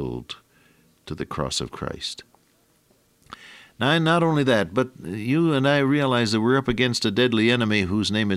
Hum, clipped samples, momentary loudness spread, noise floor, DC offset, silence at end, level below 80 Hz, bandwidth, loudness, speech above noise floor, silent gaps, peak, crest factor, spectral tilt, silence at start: none; under 0.1%; 15 LU; -62 dBFS; under 0.1%; 0 s; -50 dBFS; 14.5 kHz; -22 LUFS; 41 dB; none; -6 dBFS; 18 dB; -5.5 dB/octave; 0 s